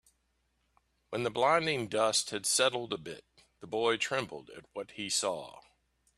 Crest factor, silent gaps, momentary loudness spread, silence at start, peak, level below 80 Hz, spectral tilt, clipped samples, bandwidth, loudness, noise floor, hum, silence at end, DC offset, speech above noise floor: 22 dB; none; 17 LU; 1.1 s; -12 dBFS; -72 dBFS; -2 dB/octave; under 0.1%; 15 kHz; -31 LUFS; -76 dBFS; none; 0.6 s; under 0.1%; 44 dB